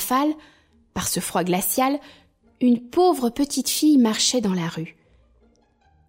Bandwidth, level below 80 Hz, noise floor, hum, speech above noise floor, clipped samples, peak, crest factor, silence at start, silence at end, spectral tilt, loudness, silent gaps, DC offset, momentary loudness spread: 16.5 kHz; -54 dBFS; -60 dBFS; none; 39 dB; under 0.1%; -8 dBFS; 16 dB; 0 s; 1.2 s; -4 dB/octave; -21 LUFS; none; under 0.1%; 13 LU